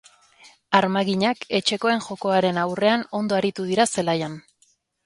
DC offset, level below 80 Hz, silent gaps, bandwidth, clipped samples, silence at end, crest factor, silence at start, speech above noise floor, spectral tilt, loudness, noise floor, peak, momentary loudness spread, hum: under 0.1%; -66 dBFS; none; 11.5 kHz; under 0.1%; 0.65 s; 22 dB; 0.45 s; 42 dB; -4.5 dB/octave; -22 LUFS; -64 dBFS; 0 dBFS; 4 LU; none